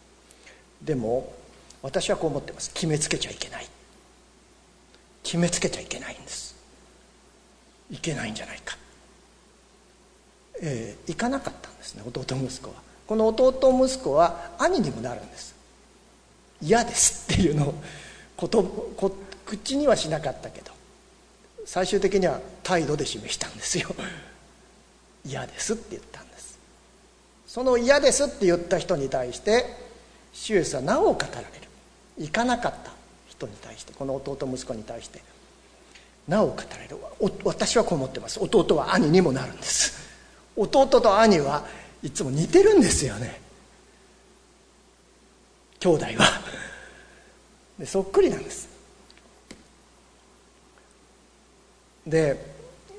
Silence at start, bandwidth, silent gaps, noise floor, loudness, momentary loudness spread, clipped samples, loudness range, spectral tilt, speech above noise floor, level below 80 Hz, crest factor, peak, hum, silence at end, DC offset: 0.8 s; 11 kHz; none; -57 dBFS; -24 LUFS; 22 LU; under 0.1%; 13 LU; -4 dB/octave; 33 dB; -48 dBFS; 26 dB; 0 dBFS; none; 0 s; under 0.1%